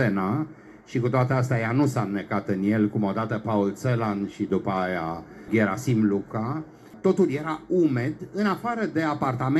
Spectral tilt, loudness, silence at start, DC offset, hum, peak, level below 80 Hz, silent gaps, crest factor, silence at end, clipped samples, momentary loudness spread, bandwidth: -7.5 dB/octave; -25 LUFS; 0 s; under 0.1%; none; -10 dBFS; -60 dBFS; none; 16 dB; 0 s; under 0.1%; 7 LU; 13 kHz